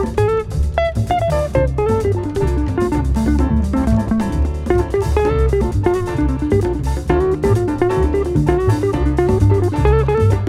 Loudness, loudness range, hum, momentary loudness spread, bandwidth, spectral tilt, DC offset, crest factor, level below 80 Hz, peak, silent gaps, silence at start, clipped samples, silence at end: -17 LUFS; 2 LU; none; 4 LU; 13 kHz; -8 dB/octave; under 0.1%; 16 dB; -22 dBFS; 0 dBFS; none; 0 s; under 0.1%; 0 s